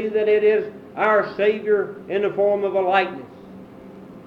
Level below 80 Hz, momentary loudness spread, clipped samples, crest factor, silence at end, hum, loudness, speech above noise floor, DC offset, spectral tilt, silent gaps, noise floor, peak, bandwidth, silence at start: -66 dBFS; 18 LU; under 0.1%; 16 dB; 0 s; none; -20 LUFS; 21 dB; under 0.1%; -7 dB/octave; none; -41 dBFS; -6 dBFS; 5.4 kHz; 0 s